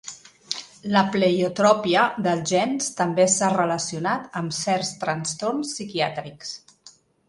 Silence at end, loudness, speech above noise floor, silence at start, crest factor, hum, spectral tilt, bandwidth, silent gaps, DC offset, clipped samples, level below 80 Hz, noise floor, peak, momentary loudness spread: 0.4 s; -23 LUFS; 30 dB; 0.05 s; 20 dB; none; -4 dB/octave; 11.5 kHz; none; under 0.1%; under 0.1%; -64 dBFS; -53 dBFS; -4 dBFS; 13 LU